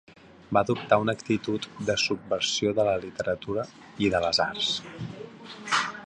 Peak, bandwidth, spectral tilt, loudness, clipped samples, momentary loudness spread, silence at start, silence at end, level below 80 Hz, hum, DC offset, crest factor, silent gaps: -6 dBFS; 11 kHz; -4 dB/octave; -27 LUFS; under 0.1%; 15 LU; 0.1 s; 0 s; -56 dBFS; none; under 0.1%; 20 dB; none